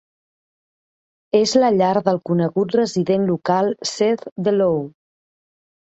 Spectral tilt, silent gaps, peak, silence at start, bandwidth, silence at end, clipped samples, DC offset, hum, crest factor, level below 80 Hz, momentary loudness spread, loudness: -5.5 dB/octave; 4.32-4.36 s; -2 dBFS; 1.35 s; 8.2 kHz; 1.1 s; under 0.1%; under 0.1%; none; 18 dB; -62 dBFS; 5 LU; -19 LUFS